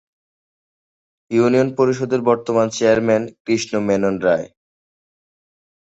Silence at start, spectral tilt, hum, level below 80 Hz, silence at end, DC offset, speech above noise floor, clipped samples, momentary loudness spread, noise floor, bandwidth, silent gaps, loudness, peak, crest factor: 1.3 s; -5.5 dB/octave; none; -56 dBFS; 1.45 s; under 0.1%; over 73 dB; under 0.1%; 6 LU; under -90 dBFS; 8.2 kHz; 3.40-3.45 s; -18 LUFS; -2 dBFS; 18 dB